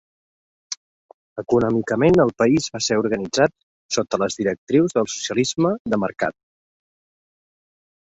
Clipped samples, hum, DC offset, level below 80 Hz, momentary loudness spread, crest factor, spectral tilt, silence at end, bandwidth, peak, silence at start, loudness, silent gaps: under 0.1%; none; under 0.1%; -54 dBFS; 13 LU; 18 dB; -5 dB/octave; 1.7 s; 8.2 kHz; -4 dBFS; 0.7 s; -20 LUFS; 0.77-1.36 s, 3.63-3.89 s, 4.58-4.67 s, 5.80-5.85 s